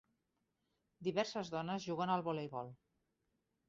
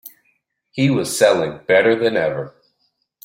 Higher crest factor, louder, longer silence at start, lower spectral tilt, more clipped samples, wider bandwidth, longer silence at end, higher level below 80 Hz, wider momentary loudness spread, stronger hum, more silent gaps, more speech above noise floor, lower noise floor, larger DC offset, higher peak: about the same, 20 dB vs 18 dB; second, -40 LUFS vs -17 LUFS; first, 1 s vs 0.05 s; about the same, -4.5 dB/octave vs -5 dB/octave; neither; second, 7.6 kHz vs 16.5 kHz; first, 0.95 s vs 0.75 s; second, -80 dBFS vs -60 dBFS; second, 9 LU vs 14 LU; neither; neither; second, 45 dB vs 52 dB; first, -85 dBFS vs -68 dBFS; neither; second, -22 dBFS vs -2 dBFS